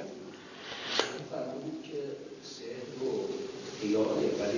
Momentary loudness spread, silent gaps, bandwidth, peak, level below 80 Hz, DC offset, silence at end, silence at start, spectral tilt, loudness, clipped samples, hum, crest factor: 14 LU; none; 7.4 kHz; -10 dBFS; -70 dBFS; under 0.1%; 0 s; 0 s; -4 dB/octave; -35 LUFS; under 0.1%; none; 26 dB